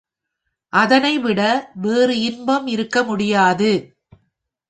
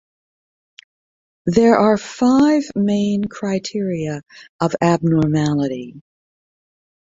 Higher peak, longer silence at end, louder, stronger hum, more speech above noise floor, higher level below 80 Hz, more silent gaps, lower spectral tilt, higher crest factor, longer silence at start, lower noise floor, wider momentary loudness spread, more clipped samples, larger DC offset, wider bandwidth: about the same, -2 dBFS vs -2 dBFS; about the same, 0.9 s vs 1 s; about the same, -17 LUFS vs -18 LUFS; neither; second, 60 dB vs over 73 dB; second, -60 dBFS vs -52 dBFS; second, none vs 4.49-4.59 s; second, -5 dB/octave vs -7 dB/octave; about the same, 18 dB vs 18 dB; second, 0.75 s vs 1.45 s; second, -77 dBFS vs under -90 dBFS; second, 6 LU vs 12 LU; neither; neither; first, 9.4 kHz vs 7.8 kHz